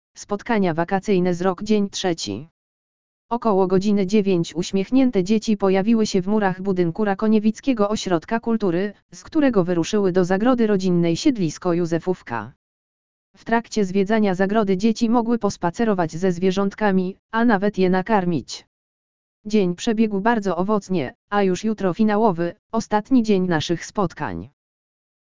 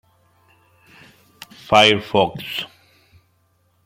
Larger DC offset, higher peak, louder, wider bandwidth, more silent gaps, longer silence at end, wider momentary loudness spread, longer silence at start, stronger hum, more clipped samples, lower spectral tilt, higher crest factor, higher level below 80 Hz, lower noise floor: first, 2% vs under 0.1%; about the same, -2 dBFS vs 0 dBFS; second, -21 LUFS vs -17 LUFS; second, 7.6 kHz vs 16.5 kHz; first, 2.51-3.29 s, 9.02-9.09 s, 12.56-13.34 s, 17.19-17.29 s, 18.67-19.44 s, 21.15-21.28 s, 22.59-22.70 s vs none; second, 0.7 s vs 1.2 s; second, 7 LU vs 20 LU; second, 0.15 s vs 1.7 s; neither; neither; first, -6 dB/octave vs -4 dB/octave; about the same, 18 dB vs 22 dB; first, -50 dBFS vs -56 dBFS; first, under -90 dBFS vs -63 dBFS